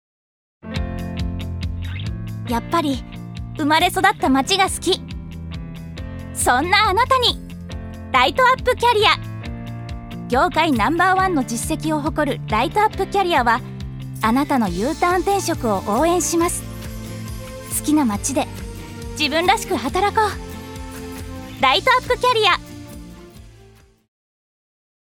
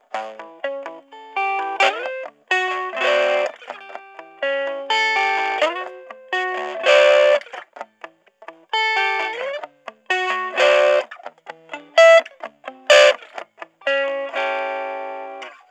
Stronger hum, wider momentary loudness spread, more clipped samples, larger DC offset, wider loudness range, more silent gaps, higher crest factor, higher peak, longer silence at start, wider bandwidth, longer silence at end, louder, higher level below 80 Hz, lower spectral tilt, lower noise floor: neither; second, 17 LU vs 23 LU; neither; neither; about the same, 4 LU vs 6 LU; neither; about the same, 20 dB vs 20 dB; about the same, 0 dBFS vs 0 dBFS; first, 0.65 s vs 0.15 s; first, 18.5 kHz vs 10.5 kHz; first, 1.65 s vs 0.15 s; about the same, -18 LUFS vs -18 LUFS; first, -36 dBFS vs under -90 dBFS; first, -4 dB/octave vs 0.5 dB/octave; first, -49 dBFS vs -44 dBFS